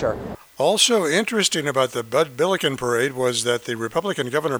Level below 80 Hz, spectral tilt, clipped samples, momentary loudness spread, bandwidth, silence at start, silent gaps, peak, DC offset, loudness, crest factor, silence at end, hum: -54 dBFS; -3 dB/octave; under 0.1%; 8 LU; over 20 kHz; 0 s; none; -4 dBFS; under 0.1%; -21 LUFS; 18 dB; 0 s; none